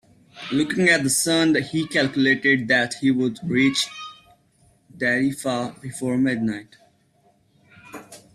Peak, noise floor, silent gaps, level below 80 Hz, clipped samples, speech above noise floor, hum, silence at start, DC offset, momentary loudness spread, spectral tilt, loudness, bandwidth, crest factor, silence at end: -6 dBFS; -61 dBFS; none; -62 dBFS; under 0.1%; 40 dB; none; 0.35 s; under 0.1%; 19 LU; -4 dB/octave; -21 LUFS; 14 kHz; 18 dB; 0.2 s